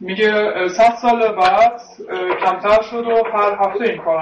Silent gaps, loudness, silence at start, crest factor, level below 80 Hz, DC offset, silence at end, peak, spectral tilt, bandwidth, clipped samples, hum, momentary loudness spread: none; -16 LUFS; 0 s; 12 dB; -50 dBFS; under 0.1%; 0 s; -4 dBFS; -4.5 dB/octave; 8.4 kHz; under 0.1%; none; 7 LU